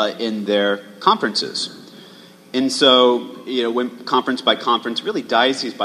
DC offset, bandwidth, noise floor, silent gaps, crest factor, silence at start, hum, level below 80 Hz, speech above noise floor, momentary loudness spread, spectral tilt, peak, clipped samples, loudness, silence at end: under 0.1%; 14.5 kHz; -44 dBFS; none; 20 dB; 0 s; none; -70 dBFS; 25 dB; 11 LU; -3 dB/octave; 0 dBFS; under 0.1%; -18 LUFS; 0 s